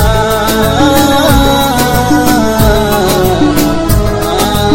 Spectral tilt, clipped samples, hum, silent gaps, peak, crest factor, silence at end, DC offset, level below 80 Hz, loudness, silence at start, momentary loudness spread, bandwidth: -5 dB/octave; 0.5%; none; none; 0 dBFS; 8 dB; 0 s; under 0.1%; -18 dBFS; -9 LUFS; 0 s; 4 LU; over 20 kHz